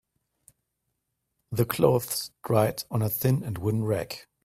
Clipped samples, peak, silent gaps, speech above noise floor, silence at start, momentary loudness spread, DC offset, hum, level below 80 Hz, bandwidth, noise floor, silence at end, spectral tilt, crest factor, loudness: under 0.1%; -6 dBFS; none; 54 dB; 1.5 s; 8 LU; under 0.1%; none; -58 dBFS; 16 kHz; -80 dBFS; 0.25 s; -6 dB/octave; 22 dB; -27 LUFS